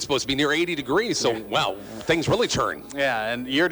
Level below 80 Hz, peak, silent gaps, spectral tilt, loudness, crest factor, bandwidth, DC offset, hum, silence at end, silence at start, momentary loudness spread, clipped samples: -50 dBFS; -10 dBFS; none; -3.5 dB/octave; -23 LUFS; 14 dB; over 20 kHz; under 0.1%; none; 0 s; 0 s; 5 LU; under 0.1%